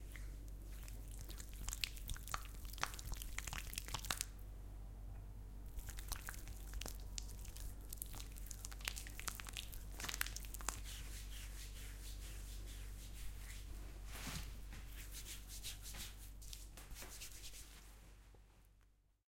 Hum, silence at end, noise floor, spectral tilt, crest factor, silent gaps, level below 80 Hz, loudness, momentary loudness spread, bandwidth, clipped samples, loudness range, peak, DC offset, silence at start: none; 0.3 s; -72 dBFS; -2 dB/octave; 34 dB; none; -52 dBFS; -49 LUFS; 11 LU; 17 kHz; under 0.1%; 5 LU; -14 dBFS; under 0.1%; 0 s